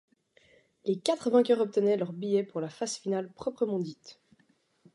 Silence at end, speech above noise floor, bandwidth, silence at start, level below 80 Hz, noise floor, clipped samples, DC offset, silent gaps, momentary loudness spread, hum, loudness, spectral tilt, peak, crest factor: 0.8 s; 40 dB; 11.5 kHz; 0.85 s; -76 dBFS; -69 dBFS; under 0.1%; under 0.1%; none; 12 LU; none; -30 LUFS; -5.5 dB/octave; -10 dBFS; 20 dB